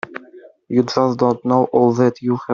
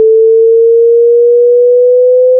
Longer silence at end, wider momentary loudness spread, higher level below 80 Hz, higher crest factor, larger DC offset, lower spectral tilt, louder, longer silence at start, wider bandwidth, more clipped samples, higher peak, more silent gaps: about the same, 0 s vs 0 s; first, 9 LU vs 0 LU; first, -60 dBFS vs -86 dBFS; first, 14 dB vs 4 dB; neither; about the same, -7.5 dB/octave vs -7 dB/octave; second, -17 LUFS vs -6 LUFS; about the same, 0.1 s vs 0 s; first, 7.2 kHz vs 0.7 kHz; neither; about the same, -2 dBFS vs -2 dBFS; neither